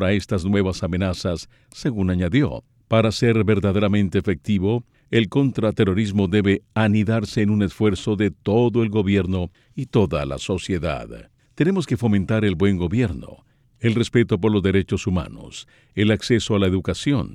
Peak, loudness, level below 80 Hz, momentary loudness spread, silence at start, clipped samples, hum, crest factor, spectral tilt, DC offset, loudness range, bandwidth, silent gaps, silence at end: -6 dBFS; -21 LUFS; -44 dBFS; 8 LU; 0 s; under 0.1%; none; 16 dB; -7 dB/octave; under 0.1%; 3 LU; 11.5 kHz; none; 0 s